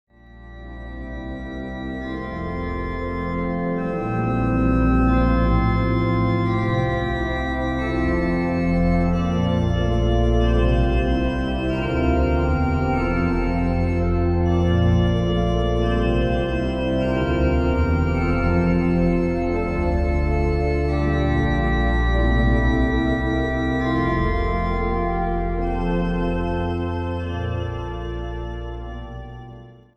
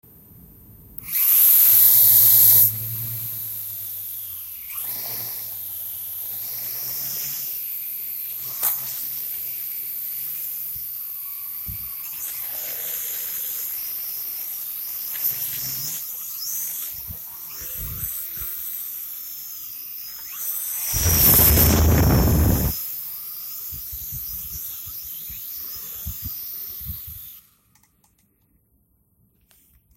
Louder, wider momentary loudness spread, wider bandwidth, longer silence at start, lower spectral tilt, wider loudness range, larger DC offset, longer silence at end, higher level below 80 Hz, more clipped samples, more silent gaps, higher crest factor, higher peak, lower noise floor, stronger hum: about the same, -22 LUFS vs -20 LUFS; second, 11 LU vs 19 LU; second, 7.4 kHz vs 16 kHz; about the same, 0.35 s vs 0.3 s; first, -8.5 dB/octave vs -3.5 dB/octave; second, 5 LU vs 16 LU; neither; second, 0.25 s vs 2.55 s; first, -26 dBFS vs -34 dBFS; neither; neither; second, 14 dB vs 22 dB; second, -6 dBFS vs -2 dBFS; second, -42 dBFS vs -64 dBFS; neither